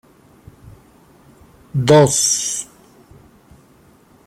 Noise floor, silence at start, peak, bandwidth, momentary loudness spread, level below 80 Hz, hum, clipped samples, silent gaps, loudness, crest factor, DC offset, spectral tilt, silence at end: -50 dBFS; 1.75 s; -2 dBFS; 16 kHz; 15 LU; -54 dBFS; none; under 0.1%; none; -15 LUFS; 20 dB; under 0.1%; -4 dB/octave; 1.65 s